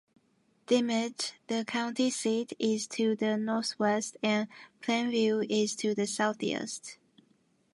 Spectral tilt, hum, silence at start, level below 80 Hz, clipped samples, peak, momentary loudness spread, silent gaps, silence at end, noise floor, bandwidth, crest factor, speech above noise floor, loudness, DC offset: -3.5 dB/octave; none; 0.7 s; -80 dBFS; under 0.1%; -14 dBFS; 7 LU; none; 0.8 s; -70 dBFS; 11.5 kHz; 18 dB; 40 dB; -30 LUFS; under 0.1%